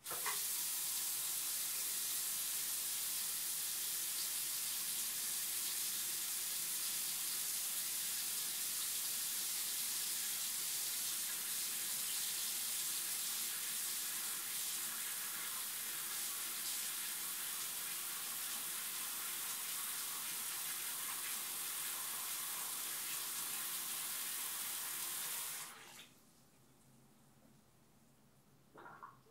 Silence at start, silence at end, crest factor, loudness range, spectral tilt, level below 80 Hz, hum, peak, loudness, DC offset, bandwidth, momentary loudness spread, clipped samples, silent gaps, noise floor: 0 s; 0 s; 16 dB; 3 LU; 2 dB/octave; -84 dBFS; none; -26 dBFS; -38 LUFS; under 0.1%; 16 kHz; 3 LU; under 0.1%; none; -69 dBFS